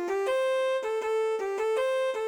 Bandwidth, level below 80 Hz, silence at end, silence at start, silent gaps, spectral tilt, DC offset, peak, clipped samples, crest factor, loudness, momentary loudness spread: 17.5 kHz; -72 dBFS; 0 s; 0 s; none; -1.5 dB/octave; under 0.1%; -18 dBFS; under 0.1%; 10 dB; -28 LUFS; 3 LU